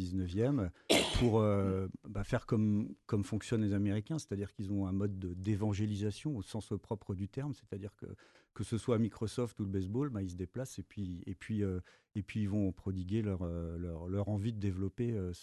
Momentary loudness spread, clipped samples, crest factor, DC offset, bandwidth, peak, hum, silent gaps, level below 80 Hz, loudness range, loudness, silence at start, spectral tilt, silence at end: 12 LU; under 0.1%; 22 dB; under 0.1%; 12 kHz; -12 dBFS; none; none; -52 dBFS; 6 LU; -36 LUFS; 0 s; -6.5 dB/octave; 0 s